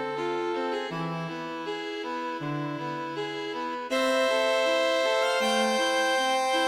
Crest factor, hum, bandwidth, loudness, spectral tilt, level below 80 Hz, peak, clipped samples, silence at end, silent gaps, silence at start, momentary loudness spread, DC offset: 14 dB; none; 16 kHz; -27 LUFS; -3.5 dB/octave; -68 dBFS; -14 dBFS; under 0.1%; 0 s; none; 0 s; 9 LU; under 0.1%